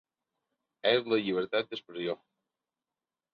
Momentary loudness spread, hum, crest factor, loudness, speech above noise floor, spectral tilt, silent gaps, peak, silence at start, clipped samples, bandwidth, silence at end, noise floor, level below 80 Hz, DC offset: 10 LU; none; 22 dB; -31 LUFS; over 60 dB; -6.5 dB/octave; none; -12 dBFS; 0.85 s; under 0.1%; 6.2 kHz; 1.2 s; under -90 dBFS; -78 dBFS; under 0.1%